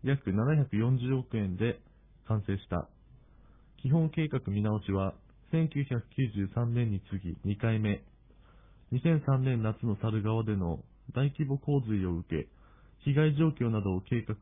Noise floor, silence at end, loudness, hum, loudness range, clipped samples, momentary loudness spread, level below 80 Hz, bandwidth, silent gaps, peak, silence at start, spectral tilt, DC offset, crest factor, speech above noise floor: -58 dBFS; 0.05 s; -31 LUFS; none; 3 LU; under 0.1%; 9 LU; -54 dBFS; 3.8 kHz; none; -16 dBFS; 0 s; -12 dB/octave; under 0.1%; 16 dB; 28 dB